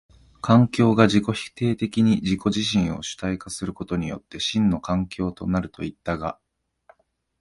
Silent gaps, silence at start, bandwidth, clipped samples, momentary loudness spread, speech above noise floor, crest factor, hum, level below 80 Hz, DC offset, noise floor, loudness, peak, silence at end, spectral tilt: none; 0.45 s; 11.5 kHz; under 0.1%; 13 LU; 38 dB; 22 dB; none; -46 dBFS; under 0.1%; -60 dBFS; -23 LUFS; -2 dBFS; 1.05 s; -6 dB/octave